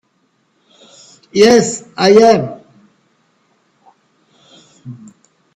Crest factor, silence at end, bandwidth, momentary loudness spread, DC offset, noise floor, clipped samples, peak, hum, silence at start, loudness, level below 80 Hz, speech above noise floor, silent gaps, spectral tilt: 16 dB; 0.65 s; 12 kHz; 26 LU; under 0.1%; -61 dBFS; under 0.1%; 0 dBFS; none; 1.35 s; -11 LUFS; -56 dBFS; 51 dB; none; -4.5 dB/octave